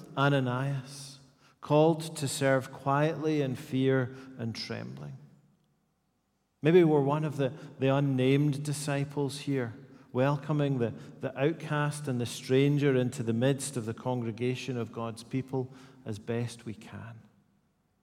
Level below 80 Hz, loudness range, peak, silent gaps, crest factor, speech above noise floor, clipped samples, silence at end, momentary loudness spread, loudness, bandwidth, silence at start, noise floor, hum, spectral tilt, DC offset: -74 dBFS; 7 LU; -10 dBFS; none; 20 dB; 47 dB; under 0.1%; 0.85 s; 17 LU; -30 LUFS; 14.5 kHz; 0 s; -76 dBFS; none; -6.5 dB/octave; under 0.1%